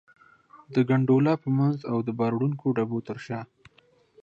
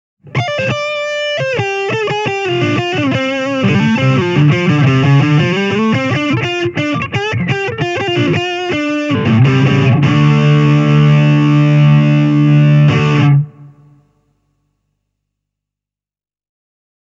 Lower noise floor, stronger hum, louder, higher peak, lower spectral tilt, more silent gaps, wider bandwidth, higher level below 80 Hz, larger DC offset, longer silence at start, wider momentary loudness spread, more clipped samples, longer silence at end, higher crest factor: second, -62 dBFS vs under -90 dBFS; second, none vs 50 Hz at -35 dBFS; second, -26 LUFS vs -12 LUFS; second, -10 dBFS vs 0 dBFS; first, -9.5 dB/octave vs -7 dB/octave; neither; about the same, 7.2 kHz vs 7.6 kHz; second, -68 dBFS vs -46 dBFS; neither; first, 0.55 s vs 0.25 s; first, 13 LU vs 7 LU; neither; second, 0.8 s vs 3.35 s; about the same, 16 dB vs 12 dB